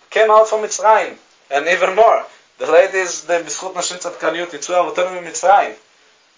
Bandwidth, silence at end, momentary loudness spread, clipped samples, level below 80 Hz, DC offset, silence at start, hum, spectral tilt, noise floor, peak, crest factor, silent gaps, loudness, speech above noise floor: 7.8 kHz; 0.65 s; 11 LU; under 0.1%; -66 dBFS; under 0.1%; 0.1 s; none; -1.5 dB/octave; -53 dBFS; 0 dBFS; 16 dB; none; -16 LUFS; 38 dB